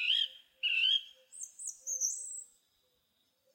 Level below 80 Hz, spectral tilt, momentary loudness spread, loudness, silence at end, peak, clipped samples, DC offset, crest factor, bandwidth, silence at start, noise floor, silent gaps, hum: under -90 dBFS; 7 dB/octave; 18 LU; -32 LUFS; 1.1 s; -20 dBFS; under 0.1%; under 0.1%; 18 dB; 16 kHz; 0 s; -77 dBFS; none; none